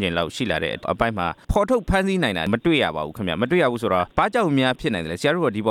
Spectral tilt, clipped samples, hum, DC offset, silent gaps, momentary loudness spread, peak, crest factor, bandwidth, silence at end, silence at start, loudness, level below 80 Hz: -6 dB/octave; under 0.1%; none; under 0.1%; none; 5 LU; -4 dBFS; 18 dB; 15.5 kHz; 0 s; 0 s; -22 LUFS; -38 dBFS